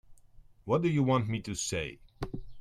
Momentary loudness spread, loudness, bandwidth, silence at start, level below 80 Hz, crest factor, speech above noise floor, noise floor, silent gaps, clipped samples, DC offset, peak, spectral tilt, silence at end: 15 LU; -31 LUFS; 13.5 kHz; 0.1 s; -52 dBFS; 18 dB; 26 dB; -56 dBFS; none; under 0.1%; under 0.1%; -14 dBFS; -5.5 dB/octave; 0 s